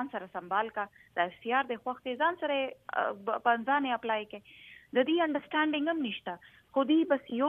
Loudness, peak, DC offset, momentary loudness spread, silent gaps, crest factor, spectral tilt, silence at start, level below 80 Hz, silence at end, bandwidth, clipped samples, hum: -31 LUFS; -12 dBFS; under 0.1%; 12 LU; none; 20 dB; -6.5 dB/octave; 0 s; -76 dBFS; 0 s; 3.8 kHz; under 0.1%; none